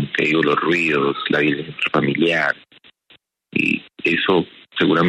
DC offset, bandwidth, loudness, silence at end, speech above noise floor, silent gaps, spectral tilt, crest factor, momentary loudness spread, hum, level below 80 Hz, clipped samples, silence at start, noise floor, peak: under 0.1%; 9.6 kHz; -19 LUFS; 0 s; 37 dB; none; -6 dB/octave; 16 dB; 5 LU; none; -60 dBFS; under 0.1%; 0 s; -55 dBFS; -4 dBFS